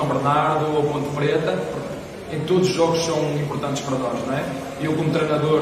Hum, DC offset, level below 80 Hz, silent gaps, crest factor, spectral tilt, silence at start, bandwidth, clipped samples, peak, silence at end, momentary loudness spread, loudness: none; under 0.1%; -52 dBFS; none; 16 dB; -6 dB/octave; 0 s; 15 kHz; under 0.1%; -6 dBFS; 0 s; 10 LU; -22 LUFS